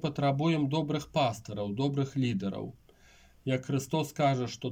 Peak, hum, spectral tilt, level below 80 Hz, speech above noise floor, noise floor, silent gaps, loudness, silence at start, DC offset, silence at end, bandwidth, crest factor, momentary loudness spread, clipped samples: -16 dBFS; none; -6.5 dB/octave; -62 dBFS; 29 dB; -59 dBFS; none; -31 LUFS; 0 s; under 0.1%; 0 s; 16.5 kHz; 16 dB; 9 LU; under 0.1%